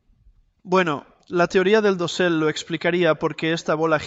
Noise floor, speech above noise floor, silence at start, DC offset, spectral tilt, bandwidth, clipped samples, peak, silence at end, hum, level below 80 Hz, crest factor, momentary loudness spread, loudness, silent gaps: -57 dBFS; 36 dB; 0.65 s; under 0.1%; -5.5 dB/octave; 8.2 kHz; under 0.1%; -6 dBFS; 0 s; none; -58 dBFS; 16 dB; 6 LU; -21 LUFS; none